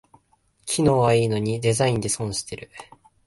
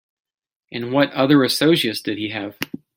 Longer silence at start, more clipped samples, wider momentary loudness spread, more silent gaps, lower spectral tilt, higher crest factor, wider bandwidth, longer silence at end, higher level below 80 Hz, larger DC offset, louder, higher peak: about the same, 0.65 s vs 0.7 s; neither; first, 18 LU vs 15 LU; neither; about the same, -5 dB/octave vs -5 dB/octave; about the same, 16 dB vs 20 dB; second, 12 kHz vs 16.5 kHz; first, 0.45 s vs 0.3 s; first, -52 dBFS vs -64 dBFS; neither; second, -22 LUFS vs -19 LUFS; second, -8 dBFS vs 0 dBFS